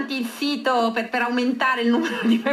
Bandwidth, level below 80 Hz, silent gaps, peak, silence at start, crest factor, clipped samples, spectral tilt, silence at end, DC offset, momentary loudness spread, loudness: 14.5 kHz; -84 dBFS; none; -8 dBFS; 0 s; 14 dB; under 0.1%; -4.5 dB/octave; 0 s; under 0.1%; 4 LU; -22 LUFS